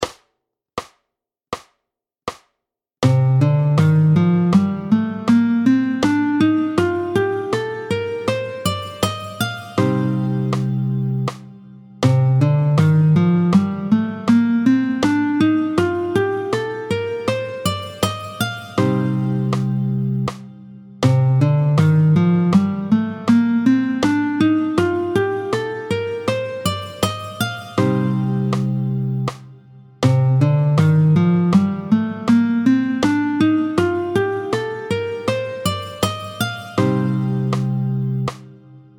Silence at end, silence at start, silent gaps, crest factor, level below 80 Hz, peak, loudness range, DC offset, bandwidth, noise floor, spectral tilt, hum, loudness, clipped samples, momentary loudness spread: 0.2 s; 0 s; none; 16 dB; -52 dBFS; -2 dBFS; 6 LU; under 0.1%; 19 kHz; -81 dBFS; -7 dB/octave; none; -18 LUFS; under 0.1%; 9 LU